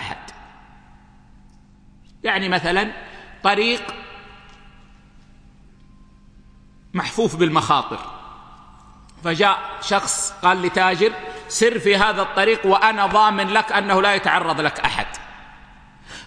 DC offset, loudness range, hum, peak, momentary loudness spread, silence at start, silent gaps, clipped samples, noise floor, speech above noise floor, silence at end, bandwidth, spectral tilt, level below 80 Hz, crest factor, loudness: under 0.1%; 9 LU; none; 0 dBFS; 18 LU; 0 s; none; under 0.1%; -49 dBFS; 30 dB; 0 s; 10.5 kHz; -3 dB/octave; -48 dBFS; 22 dB; -19 LUFS